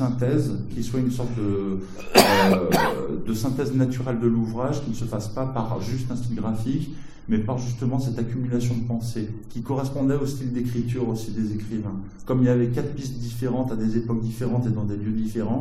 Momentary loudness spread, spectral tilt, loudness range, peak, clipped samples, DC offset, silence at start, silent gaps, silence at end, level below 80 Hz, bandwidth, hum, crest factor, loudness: 10 LU; -6 dB/octave; 6 LU; 0 dBFS; under 0.1%; under 0.1%; 0 s; none; 0 s; -42 dBFS; 16 kHz; none; 24 dB; -25 LUFS